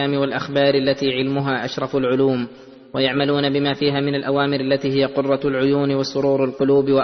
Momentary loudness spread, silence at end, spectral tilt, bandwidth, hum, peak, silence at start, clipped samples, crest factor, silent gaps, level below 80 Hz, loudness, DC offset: 4 LU; 0 s; -6.5 dB/octave; 6.4 kHz; none; -4 dBFS; 0 s; under 0.1%; 16 dB; none; -56 dBFS; -19 LUFS; under 0.1%